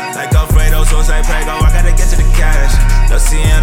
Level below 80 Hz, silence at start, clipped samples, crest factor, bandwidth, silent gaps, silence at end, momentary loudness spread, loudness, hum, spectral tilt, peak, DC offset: -8 dBFS; 0 s; under 0.1%; 8 dB; 16 kHz; none; 0 s; 3 LU; -13 LUFS; none; -4.5 dB/octave; 0 dBFS; under 0.1%